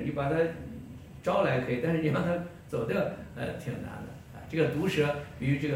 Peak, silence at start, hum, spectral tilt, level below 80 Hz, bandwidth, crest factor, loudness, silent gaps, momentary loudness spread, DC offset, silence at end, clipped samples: -14 dBFS; 0 s; none; -7 dB/octave; -54 dBFS; 16.5 kHz; 16 dB; -30 LUFS; none; 15 LU; under 0.1%; 0 s; under 0.1%